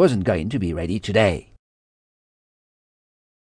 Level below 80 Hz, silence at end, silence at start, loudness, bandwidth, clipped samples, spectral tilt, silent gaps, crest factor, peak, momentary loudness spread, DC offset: -44 dBFS; 2.1 s; 0 s; -22 LUFS; 10 kHz; under 0.1%; -6.5 dB/octave; none; 18 dB; -4 dBFS; 7 LU; under 0.1%